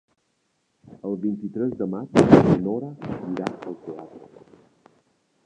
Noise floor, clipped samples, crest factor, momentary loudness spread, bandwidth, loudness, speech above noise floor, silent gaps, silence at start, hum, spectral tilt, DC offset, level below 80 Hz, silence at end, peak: -71 dBFS; under 0.1%; 24 dB; 21 LU; 10 kHz; -22 LUFS; 49 dB; none; 0.9 s; none; -8 dB/octave; under 0.1%; -52 dBFS; 1.2 s; 0 dBFS